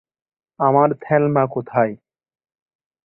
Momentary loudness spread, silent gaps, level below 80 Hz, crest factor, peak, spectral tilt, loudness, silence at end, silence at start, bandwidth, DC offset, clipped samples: 5 LU; none; -62 dBFS; 18 dB; -2 dBFS; -12.5 dB/octave; -18 LUFS; 1.1 s; 0.6 s; 3.2 kHz; under 0.1%; under 0.1%